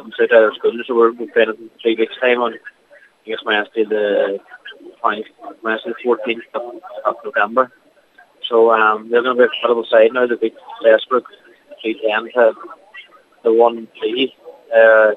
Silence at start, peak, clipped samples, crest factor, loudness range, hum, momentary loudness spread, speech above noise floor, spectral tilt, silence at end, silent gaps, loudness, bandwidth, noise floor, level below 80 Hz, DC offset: 0.05 s; 0 dBFS; under 0.1%; 16 dB; 6 LU; none; 15 LU; 34 dB; -5.5 dB/octave; 0 s; none; -16 LUFS; 4.2 kHz; -50 dBFS; -80 dBFS; under 0.1%